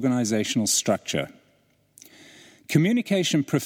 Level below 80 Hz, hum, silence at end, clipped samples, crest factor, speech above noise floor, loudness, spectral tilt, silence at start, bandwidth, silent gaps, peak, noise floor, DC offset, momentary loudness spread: -66 dBFS; 50 Hz at -50 dBFS; 0 s; under 0.1%; 18 dB; 41 dB; -23 LUFS; -4 dB/octave; 0 s; 17 kHz; none; -8 dBFS; -64 dBFS; under 0.1%; 7 LU